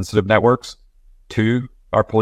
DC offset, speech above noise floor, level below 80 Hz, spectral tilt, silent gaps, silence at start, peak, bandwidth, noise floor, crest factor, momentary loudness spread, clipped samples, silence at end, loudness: under 0.1%; 32 dB; -46 dBFS; -6.5 dB/octave; none; 0 s; 0 dBFS; 13 kHz; -49 dBFS; 18 dB; 10 LU; under 0.1%; 0 s; -18 LUFS